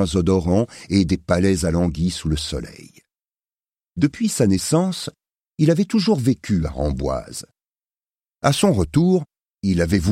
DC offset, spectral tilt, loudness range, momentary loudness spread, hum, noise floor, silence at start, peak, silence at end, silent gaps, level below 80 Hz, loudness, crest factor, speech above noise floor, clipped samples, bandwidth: under 0.1%; -6 dB/octave; 3 LU; 12 LU; none; under -90 dBFS; 0 s; -2 dBFS; 0 s; none; -36 dBFS; -20 LUFS; 18 dB; over 71 dB; under 0.1%; 15.5 kHz